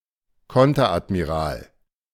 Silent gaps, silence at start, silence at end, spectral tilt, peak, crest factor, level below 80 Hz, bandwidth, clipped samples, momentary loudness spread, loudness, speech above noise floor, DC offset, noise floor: none; 0.5 s; 0.5 s; -7 dB/octave; -4 dBFS; 18 dB; -42 dBFS; 15 kHz; under 0.1%; 11 LU; -21 LUFS; 41 dB; under 0.1%; -61 dBFS